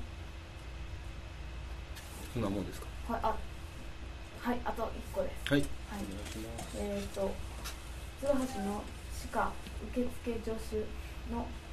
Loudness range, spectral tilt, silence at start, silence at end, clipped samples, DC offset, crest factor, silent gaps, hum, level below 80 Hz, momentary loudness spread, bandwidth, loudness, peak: 3 LU; -5.5 dB/octave; 0 s; 0 s; under 0.1%; under 0.1%; 24 dB; none; none; -46 dBFS; 13 LU; 14 kHz; -39 LUFS; -14 dBFS